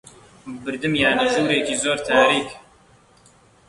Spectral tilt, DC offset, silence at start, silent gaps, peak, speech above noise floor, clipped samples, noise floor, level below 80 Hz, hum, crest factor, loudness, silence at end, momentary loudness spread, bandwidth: -3 dB/octave; under 0.1%; 0.45 s; none; -2 dBFS; 34 dB; under 0.1%; -54 dBFS; -54 dBFS; none; 20 dB; -19 LUFS; 1.1 s; 16 LU; 11.5 kHz